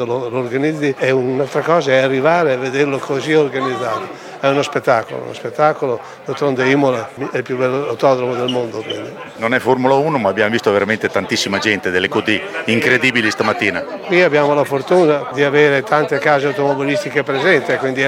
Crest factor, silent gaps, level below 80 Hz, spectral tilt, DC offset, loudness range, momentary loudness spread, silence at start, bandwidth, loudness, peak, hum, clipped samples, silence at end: 16 dB; none; -62 dBFS; -5 dB/octave; under 0.1%; 3 LU; 9 LU; 0 s; 16 kHz; -16 LUFS; 0 dBFS; none; under 0.1%; 0 s